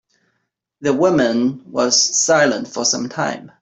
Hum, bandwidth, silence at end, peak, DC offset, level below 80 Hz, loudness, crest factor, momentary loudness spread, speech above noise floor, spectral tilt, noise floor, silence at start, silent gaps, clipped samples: none; 8.4 kHz; 0.15 s; -2 dBFS; under 0.1%; -60 dBFS; -16 LUFS; 16 dB; 9 LU; 55 dB; -2.5 dB/octave; -72 dBFS; 0.8 s; none; under 0.1%